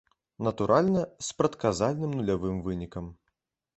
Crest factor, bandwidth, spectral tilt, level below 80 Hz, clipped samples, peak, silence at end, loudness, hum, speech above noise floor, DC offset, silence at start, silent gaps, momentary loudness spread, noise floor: 20 dB; 8.4 kHz; -6 dB/octave; -52 dBFS; under 0.1%; -8 dBFS; 0.65 s; -28 LUFS; none; 53 dB; under 0.1%; 0.4 s; none; 12 LU; -81 dBFS